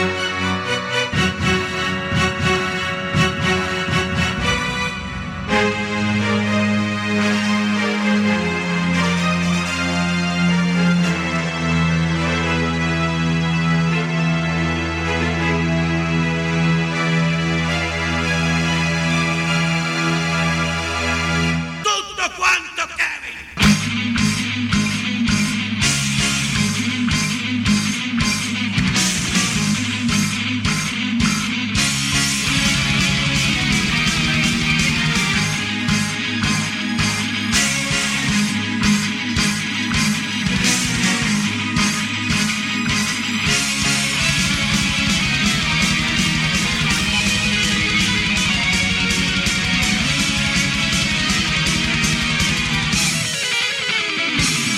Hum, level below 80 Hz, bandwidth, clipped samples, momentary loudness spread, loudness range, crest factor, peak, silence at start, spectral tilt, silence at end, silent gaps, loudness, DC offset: none; -38 dBFS; 16 kHz; under 0.1%; 4 LU; 3 LU; 16 dB; -4 dBFS; 0 s; -3.5 dB/octave; 0 s; none; -18 LUFS; under 0.1%